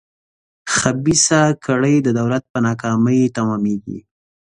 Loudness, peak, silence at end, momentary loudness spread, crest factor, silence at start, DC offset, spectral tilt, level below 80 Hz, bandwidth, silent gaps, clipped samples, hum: -17 LUFS; 0 dBFS; 0.6 s; 10 LU; 18 dB; 0.65 s; under 0.1%; -4.5 dB/octave; -50 dBFS; 11.5 kHz; 2.50-2.54 s; under 0.1%; none